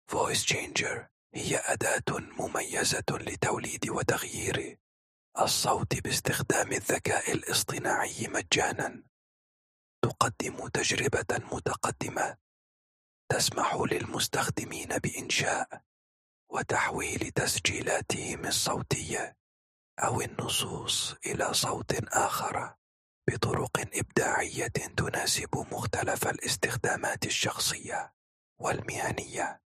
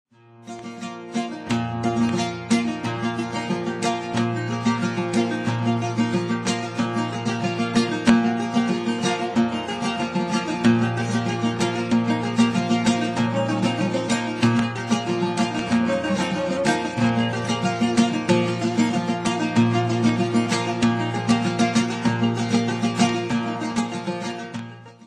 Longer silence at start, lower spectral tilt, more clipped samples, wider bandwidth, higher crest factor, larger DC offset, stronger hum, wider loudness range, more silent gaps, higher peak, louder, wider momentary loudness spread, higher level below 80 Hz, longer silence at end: second, 0.1 s vs 0.4 s; second, -3 dB/octave vs -5.5 dB/octave; neither; first, 15 kHz vs 11.5 kHz; about the same, 22 dB vs 18 dB; neither; neither; about the same, 2 LU vs 3 LU; first, 1.11-1.30 s, 4.80-5.32 s, 9.09-10.02 s, 12.41-13.28 s, 15.86-16.47 s, 19.40-19.97 s, 22.78-23.22 s, 28.13-28.56 s vs none; second, -10 dBFS vs -4 dBFS; second, -30 LUFS vs -22 LUFS; about the same, 8 LU vs 6 LU; about the same, -58 dBFS vs -58 dBFS; first, 0.2 s vs 0 s